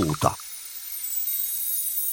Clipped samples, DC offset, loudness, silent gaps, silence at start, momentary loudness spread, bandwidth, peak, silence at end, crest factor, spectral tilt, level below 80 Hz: under 0.1%; under 0.1%; -26 LUFS; none; 0 s; 10 LU; 17 kHz; -4 dBFS; 0 s; 24 dB; -3.5 dB/octave; -52 dBFS